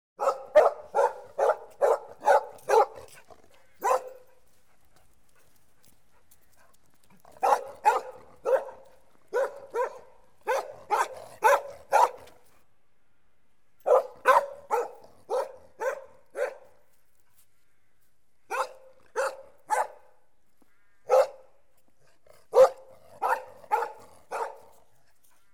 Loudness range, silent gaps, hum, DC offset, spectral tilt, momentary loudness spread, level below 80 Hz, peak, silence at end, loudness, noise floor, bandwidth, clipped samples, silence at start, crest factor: 9 LU; none; none; 0.2%; -2 dB/octave; 13 LU; -72 dBFS; -8 dBFS; 1 s; -27 LUFS; -74 dBFS; 16.5 kHz; under 0.1%; 0.2 s; 20 dB